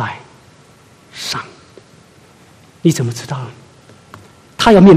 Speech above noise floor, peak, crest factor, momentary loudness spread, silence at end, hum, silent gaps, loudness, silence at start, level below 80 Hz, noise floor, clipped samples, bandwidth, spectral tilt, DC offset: 36 dB; 0 dBFS; 16 dB; 25 LU; 0 s; none; none; -16 LUFS; 0 s; -44 dBFS; -46 dBFS; 0.2%; 15 kHz; -6 dB/octave; under 0.1%